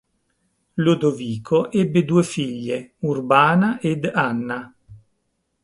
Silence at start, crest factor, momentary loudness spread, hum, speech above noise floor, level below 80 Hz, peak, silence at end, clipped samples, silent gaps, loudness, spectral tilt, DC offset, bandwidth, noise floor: 0.75 s; 20 dB; 12 LU; none; 52 dB; -60 dBFS; -2 dBFS; 0.65 s; under 0.1%; none; -20 LUFS; -6.5 dB/octave; under 0.1%; 11.5 kHz; -72 dBFS